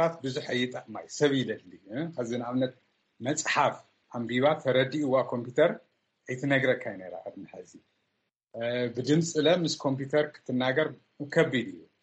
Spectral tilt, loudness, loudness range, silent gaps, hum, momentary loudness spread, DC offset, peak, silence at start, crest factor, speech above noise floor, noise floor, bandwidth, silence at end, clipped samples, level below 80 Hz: -5 dB/octave; -28 LUFS; 4 LU; none; none; 16 LU; under 0.1%; -10 dBFS; 0 s; 20 dB; 51 dB; -80 dBFS; 8.4 kHz; 0.2 s; under 0.1%; -72 dBFS